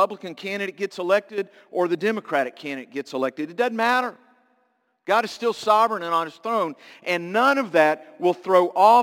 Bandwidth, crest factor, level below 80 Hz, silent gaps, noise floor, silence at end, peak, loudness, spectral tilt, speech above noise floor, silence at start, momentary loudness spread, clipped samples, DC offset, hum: 17 kHz; 20 dB; -78 dBFS; none; -68 dBFS; 0 s; -2 dBFS; -23 LUFS; -4.5 dB/octave; 46 dB; 0 s; 12 LU; under 0.1%; under 0.1%; none